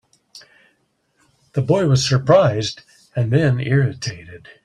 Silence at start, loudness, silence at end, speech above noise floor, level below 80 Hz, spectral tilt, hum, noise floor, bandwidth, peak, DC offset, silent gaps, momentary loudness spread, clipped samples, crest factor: 0.35 s; -18 LUFS; 0.3 s; 48 dB; -50 dBFS; -6 dB/octave; none; -65 dBFS; 10.5 kHz; -2 dBFS; under 0.1%; none; 15 LU; under 0.1%; 18 dB